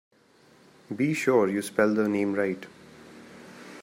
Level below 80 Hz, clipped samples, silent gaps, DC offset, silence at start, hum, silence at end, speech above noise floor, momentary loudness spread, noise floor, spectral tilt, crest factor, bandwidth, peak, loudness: -74 dBFS; under 0.1%; none; under 0.1%; 0.9 s; none; 0 s; 34 dB; 24 LU; -59 dBFS; -6 dB/octave; 20 dB; 16 kHz; -8 dBFS; -26 LUFS